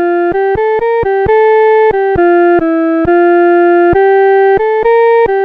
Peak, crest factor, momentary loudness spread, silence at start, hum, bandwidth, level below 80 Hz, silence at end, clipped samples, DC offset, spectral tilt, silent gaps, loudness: -2 dBFS; 8 dB; 4 LU; 0 s; none; 4.6 kHz; -36 dBFS; 0 s; under 0.1%; under 0.1%; -9 dB/octave; none; -9 LUFS